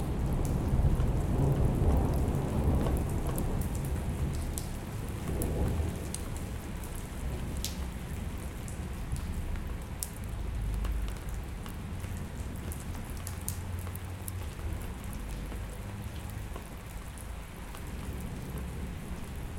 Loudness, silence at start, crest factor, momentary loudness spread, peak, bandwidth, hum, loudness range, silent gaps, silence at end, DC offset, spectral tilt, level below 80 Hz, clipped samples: -35 LUFS; 0 s; 26 dB; 11 LU; -8 dBFS; 17 kHz; none; 11 LU; none; 0 s; under 0.1%; -6 dB/octave; -36 dBFS; under 0.1%